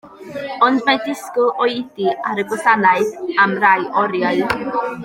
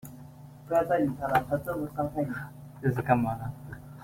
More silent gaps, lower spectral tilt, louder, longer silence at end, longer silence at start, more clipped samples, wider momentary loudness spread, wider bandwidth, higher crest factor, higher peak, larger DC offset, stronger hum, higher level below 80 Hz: neither; second, -4.5 dB/octave vs -8 dB/octave; first, -17 LUFS vs -29 LUFS; about the same, 0 s vs 0 s; about the same, 0.05 s vs 0.05 s; neither; second, 8 LU vs 19 LU; about the same, 16.5 kHz vs 16.5 kHz; second, 16 dB vs 22 dB; first, 0 dBFS vs -8 dBFS; neither; neither; about the same, -56 dBFS vs -56 dBFS